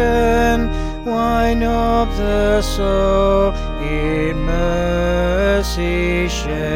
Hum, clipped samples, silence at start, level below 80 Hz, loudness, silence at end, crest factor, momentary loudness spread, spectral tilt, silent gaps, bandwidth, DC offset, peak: none; under 0.1%; 0 s; -22 dBFS; -17 LUFS; 0 s; 12 dB; 6 LU; -6 dB/octave; none; 16.5 kHz; under 0.1%; -4 dBFS